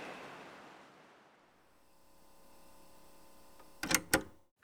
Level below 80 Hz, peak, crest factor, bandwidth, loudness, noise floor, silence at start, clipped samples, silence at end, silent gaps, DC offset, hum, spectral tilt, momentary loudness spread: -64 dBFS; -10 dBFS; 32 dB; over 20 kHz; -35 LUFS; -68 dBFS; 0 s; under 0.1%; 0.3 s; none; under 0.1%; none; -2 dB/octave; 29 LU